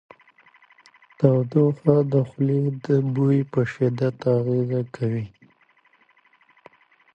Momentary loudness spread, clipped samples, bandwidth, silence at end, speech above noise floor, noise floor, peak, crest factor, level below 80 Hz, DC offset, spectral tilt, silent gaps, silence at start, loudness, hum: 7 LU; under 0.1%; 6.8 kHz; 1.85 s; 40 dB; -61 dBFS; -2 dBFS; 20 dB; -62 dBFS; under 0.1%; -10 dB/octave; none; 1.2 s; -22 LUFS; none